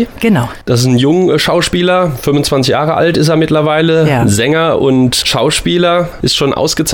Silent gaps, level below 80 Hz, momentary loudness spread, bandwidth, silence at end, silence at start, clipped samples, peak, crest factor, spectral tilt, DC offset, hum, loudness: none; -34 dBFS; 3 LU; 19.5 kHz; 0 s; 0 s; under 0.1%; -2 dBFS; 10 dB; -5 dB/octave; under 0.1%; none; -11 LUFS